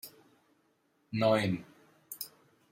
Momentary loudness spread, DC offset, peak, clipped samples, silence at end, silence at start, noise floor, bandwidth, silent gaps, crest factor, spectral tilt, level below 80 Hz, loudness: 19 LU; under 0.1%; -14 dBFS; under 0.1%; 0.45 s; 0.05 s; -73 dBFS; 16.5 kHz; none; 20 dB; -5.5 dB/octave; -74 dBFS; -33 LUFS